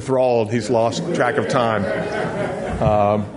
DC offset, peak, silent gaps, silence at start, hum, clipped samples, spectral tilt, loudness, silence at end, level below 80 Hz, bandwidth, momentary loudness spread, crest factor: under 0.1%; -2 dBFS; none; 0 s; none; under 0.1%; -6 dB/octave; -19 LUFS; 0 s; -42 dBFS; 11 kHz; 6 LU; 16 dB